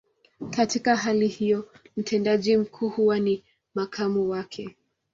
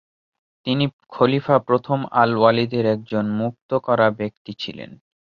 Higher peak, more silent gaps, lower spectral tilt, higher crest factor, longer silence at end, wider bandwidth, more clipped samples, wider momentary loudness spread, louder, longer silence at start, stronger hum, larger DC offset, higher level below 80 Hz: second, -8 dBFS vs -2 dBFS; second, none vs 0.93-0.99 s, 3.62-3.69 s, 4.37-4.45 s; second, -5 dB/octave vs -8.5 dB/octave; about the same, 18 dB vs 18 dB; about the same, 0.45 s vs 0.45 s; first, 7.8 kHz vs 6.8 kHz; neither; about the same, 14 LU vs 14 LU; second, -25 LUFS vs -20 LUFS; second, 0.4 s vs 0.65 s; neither; neither; about the same, -64 dBFS vs -60 dBFS